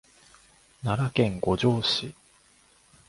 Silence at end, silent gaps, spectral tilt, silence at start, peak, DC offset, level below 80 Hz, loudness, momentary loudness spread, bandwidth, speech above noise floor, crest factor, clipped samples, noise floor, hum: 0.95 s; none; -6 dB/octave; 0.8 s; -8 dBFS; under 0.1%; -52 dBFS; -26 LUFS; 9 LU; 11.5 kHz; 35 dB; 20 dB; under 0.1%; -60 dBFS; none